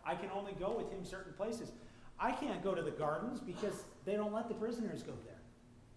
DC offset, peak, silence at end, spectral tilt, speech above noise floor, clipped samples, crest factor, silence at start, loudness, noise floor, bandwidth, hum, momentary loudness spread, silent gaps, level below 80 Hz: under 0.1%; -24 dBFS; 0 s; -6 dB/octave; 20 dB; under 0.1%; 18 dB; 0 s; -41 LUFS; -61 dBFS; 11 kHz; none; 13 LU; none; -62 dBFS